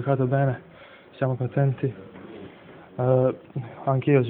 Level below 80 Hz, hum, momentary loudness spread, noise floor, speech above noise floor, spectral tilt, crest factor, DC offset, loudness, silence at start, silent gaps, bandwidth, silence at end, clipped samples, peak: -62 dBFS; none; 21 LU; -46 dBFS; 23 dB; -13 dB/octave; 18 dB; under 0.1%; -25 LUFS; 0 s; none; 3.9 kHz; 0 s; under 0.1%; -6 dBFS